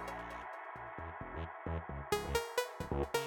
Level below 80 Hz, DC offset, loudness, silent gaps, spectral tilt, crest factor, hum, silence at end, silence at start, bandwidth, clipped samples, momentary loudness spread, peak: -50 dBFS; under 0.1%; -41 LUFS; none; -4.5 dB/octave; 20 dB; none; 0 s; 0 s; 18 kHz; under 0.1%; 10 LU; -20 dBFS